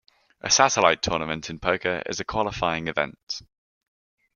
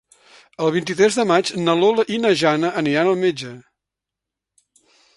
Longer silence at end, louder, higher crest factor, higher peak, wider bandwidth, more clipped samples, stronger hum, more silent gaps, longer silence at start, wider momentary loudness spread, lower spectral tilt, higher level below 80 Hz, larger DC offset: second, 0.95 s vs 1.55 s; second, -23 LUFS vs -18 LUFS; first, 24 dB vs 18 dB; about the same, -2 dBFS vs -2 dBFS; about the same, 11 kHz vs 11.5 kHz; neither; neither; first, 3.23-3.27 s vs none; second, 0.45 s vs 0.6 s; first, 15 LU vs 6 LU; second, -2.5 dB/octave vs -5 dB/octave; first, -52 dBFS vs -64 dBFS; neither